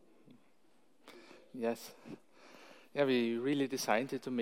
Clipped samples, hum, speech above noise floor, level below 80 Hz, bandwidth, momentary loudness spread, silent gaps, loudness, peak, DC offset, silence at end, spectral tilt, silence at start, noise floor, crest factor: under 0.1%; none; 37 dB; -86 dBFS; 16.5 kHz; 25 LU; none; -35 LUFS; -16 dBFS; under 0.1%; 0 s; -4.5 dB/octave; 1.05 s; -72 dBFS; 22 dB